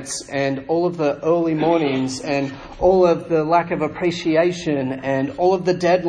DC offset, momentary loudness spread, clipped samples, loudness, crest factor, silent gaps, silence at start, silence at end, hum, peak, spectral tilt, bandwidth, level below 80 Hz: under 0.1%; 6 LU; under 0.1%; -20 LUFS; 16 dB; none; 0 s; 0 s; none; -4 dBFS; -5.5 dB/octave; 10.5 kHz; -48 dBFS